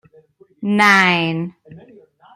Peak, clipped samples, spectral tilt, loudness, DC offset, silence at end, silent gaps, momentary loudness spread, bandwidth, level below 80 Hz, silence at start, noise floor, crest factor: 0 dBFS; under 0.1%; -4.5 dB/octave; -14 LUFS; under 0.1%; 0.55 s; none; 17 LU; 15 kHz; -64 dBFS; 0.6 s; -51 dBFS; 18 dB